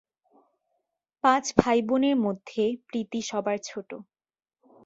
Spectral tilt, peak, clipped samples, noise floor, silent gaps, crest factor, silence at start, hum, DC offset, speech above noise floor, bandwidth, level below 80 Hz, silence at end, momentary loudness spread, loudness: -4.5 dB/octave; 0 dBFS; under 0.1%; -80 dBFS; none; 28 dB; 1.25 s; none; under 0.1%; 54 dB; 8 kHz; -56 dBFS; 0.85 s; 15 LU; -26 LUFS